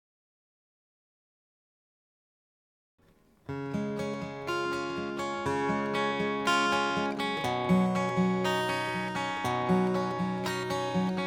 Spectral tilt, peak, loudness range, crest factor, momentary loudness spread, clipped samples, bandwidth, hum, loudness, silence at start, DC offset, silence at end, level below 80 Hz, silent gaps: -5.5 dB/octave; -14 dBFS; 12 LU; 18 dB; 8 LU; under 0.1%; 17.5 kHz; none; -30 LUFS; 3.5 s; under 0.1%; 0 s; -64 dBFS; none